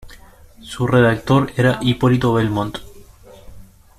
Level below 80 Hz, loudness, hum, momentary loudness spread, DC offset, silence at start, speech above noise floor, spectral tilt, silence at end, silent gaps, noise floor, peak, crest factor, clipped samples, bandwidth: -42 dBFS; -17 LUFS; none; 12 LU; under 0.1%; 0.05 s; 26 dB; -7 dB/octave; 0.35 s; none; -43 dBFS; -4 dBFS; 16 dB; under 0.1%; 14 kHz